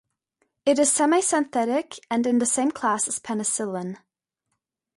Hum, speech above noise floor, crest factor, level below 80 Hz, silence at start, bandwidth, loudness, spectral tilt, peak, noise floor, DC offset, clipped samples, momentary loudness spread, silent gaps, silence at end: none; 57 dB; 16 dB; -70 dBFS; 0.65 s; 11.5 kHz; -23 LUFS; -3 dB/octave; -8 dBFS; -80 dBFS; under 0.1%; under 0.1%; 10 LU; none; 1 s